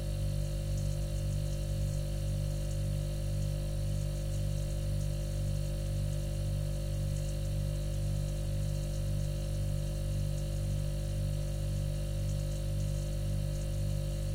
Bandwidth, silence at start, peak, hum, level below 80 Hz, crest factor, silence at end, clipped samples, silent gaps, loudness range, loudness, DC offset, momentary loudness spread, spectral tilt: 16 kHz; 0 s; -24 dBFS; 50 Hz at -35 dBFS; -36 dBFS; 10 dB; 0 s; under 0.1%; none; 0 LU; -35 LUFS; under 0.1%; 1 LU; -6.5 dB/octave